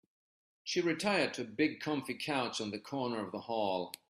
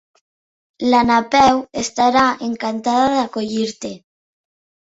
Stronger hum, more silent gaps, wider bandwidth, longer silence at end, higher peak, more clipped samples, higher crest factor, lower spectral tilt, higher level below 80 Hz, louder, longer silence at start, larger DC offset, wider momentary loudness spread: neither; neither; first, 15 kHz vs 8 kHz; second, 0.15 s vs 0.85 s; second, -18 dBFS vs -2 dBFS; neither; about the same, 18 dB vs 18 dB; about the same, -4 dB/octave vs -3.5 dB/octave; second, -78 dBFS vs -50 dBFS; second, -35 LUFS vs -17 LUFS; second, 0.65 s vs 0.8 s; neither; second, 7 LU vs 10 LU